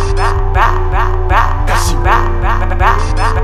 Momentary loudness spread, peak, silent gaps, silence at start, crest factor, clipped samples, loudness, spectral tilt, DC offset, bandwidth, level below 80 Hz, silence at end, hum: 3 LU; 0 dBFS; none; 0 s; 10 dB; under 0.1%; -13 LUFS; -5 dB/octave; under 0.1%; 13.5 kHz; -12 dBFS; 0 s; none